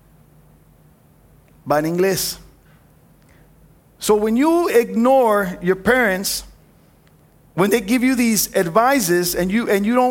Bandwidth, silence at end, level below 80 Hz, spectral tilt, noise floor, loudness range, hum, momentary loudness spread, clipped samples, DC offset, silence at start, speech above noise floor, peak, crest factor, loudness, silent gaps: 17 kHz; 0 s; -48 dBFS; -4 dB/octave; -52 dBFS; 7 LU; none; 8 LU; under 0.1%; under 0.1%; 1.65 s; 35 dB; -2 dBFS; 18 dB; -17 LUFS; none